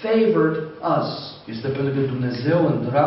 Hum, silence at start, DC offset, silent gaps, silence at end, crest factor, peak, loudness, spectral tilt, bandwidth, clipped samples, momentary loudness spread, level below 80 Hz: none; 0 s; under 0.1%; none; 0 s; 14 dB; -6 dBFS; -21 LUFS; -6 dB/octave; 5.8 kHz; under 0.1%; 11 LU; -60 dBFS